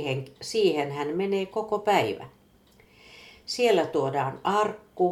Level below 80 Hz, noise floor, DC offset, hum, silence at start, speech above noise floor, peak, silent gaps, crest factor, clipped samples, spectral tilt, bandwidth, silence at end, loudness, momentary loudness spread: -66 dBFS; -58 dBFS; under 0.1%; none; 0 s; 32 dB; -8 dBFS; none; 18 dB; under 0.1%; -5 dB/octave; 15.5 kHz; 0 s; -26 LUFS; 9 LU